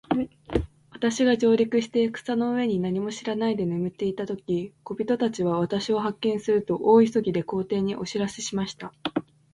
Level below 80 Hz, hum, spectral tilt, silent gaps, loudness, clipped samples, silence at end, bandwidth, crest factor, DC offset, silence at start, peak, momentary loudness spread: -50 dBFS; none; -6 dB/octave; none; -25 LUFS; under 0.1%; 0.3 s; 11.5 kHz; 18 dB; under 0.1%; 0.1 s; -8 dBFS; 10 LU